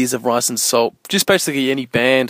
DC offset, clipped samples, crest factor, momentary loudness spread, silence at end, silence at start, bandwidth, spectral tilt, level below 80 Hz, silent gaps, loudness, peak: under 0.1%; under 0.1%; 16 dB; 3 LU; 0 s; 0 s; 16 kHz; -3 dB/octave; -58 dBFS; none; -16 LUFS; 0 dBFS